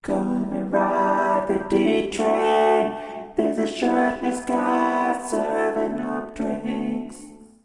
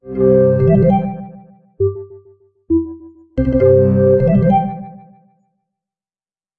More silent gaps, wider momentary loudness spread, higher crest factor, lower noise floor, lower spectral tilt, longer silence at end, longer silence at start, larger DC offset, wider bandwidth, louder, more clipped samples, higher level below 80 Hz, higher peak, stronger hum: neither; second, 8 LU vs 19 LU; about the same, 16 dB vs 14 dB; second, -43 dBFS vs under -90 dBFS; second, -5.5 dB/octave vs -12.5 dB/octave; second, 0.2 s vs 1.65 s; about the same, 0.05 s vs 0.05 s; neither; first, 11.5 kHz vs 3.4 kHz; second, -22 LUFS vs -14 LUFS; neither; second, -54 dBFS vs -34 dBFS; second, -6 dBFS vs -2 dBFS; neither